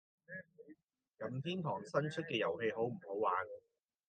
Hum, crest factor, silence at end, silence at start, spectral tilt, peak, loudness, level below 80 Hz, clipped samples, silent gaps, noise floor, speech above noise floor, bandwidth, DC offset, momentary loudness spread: none; 20 dB; 0.5 s; 0.3 s; -6.5 dB/octave; -22 dBFS; -39 LUFS; -86 dBFS; under 0.1%; 0.83-0.88 s; -66 dBFS; 27 dB; 8.8 kHz; under 0.1%; 15 LU